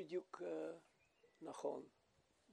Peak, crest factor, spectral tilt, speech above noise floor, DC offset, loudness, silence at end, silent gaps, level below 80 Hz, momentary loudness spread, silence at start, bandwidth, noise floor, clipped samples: -30 dBFS; 20 dB; -5.5 dB/octave; 30 dB; under 0.1%; -50 LUFS; 0 s; none; under -90 dBFS; 12 LU; 0 s; 11.5 kHz; -79 dBFS; under 0.1%